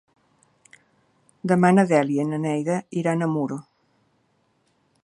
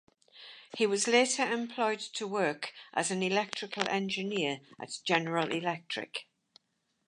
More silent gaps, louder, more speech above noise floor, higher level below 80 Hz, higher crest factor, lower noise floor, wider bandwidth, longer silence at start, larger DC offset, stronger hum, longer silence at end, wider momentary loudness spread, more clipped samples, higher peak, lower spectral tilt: neither; first, -22 LUFS vs -31 LUFS; about the same, 46 dB vs 47 dB; first, -70 dBFS vs -84 dBFS; about the same, 20 dB vs 24 dB; second, -67 dBFS vs -79 dBFS; about the same, 11 kHz vs 11.5 kHz; first, 1.45 s vs 0.35 s; neither; neither; first, 1.45 s vs 0.85 s; second, 12 LU vs 15 LU; neither; first, -4 dBFS vs -8 dBFS; first, -7.5 dB/octave vs -3 dB/octave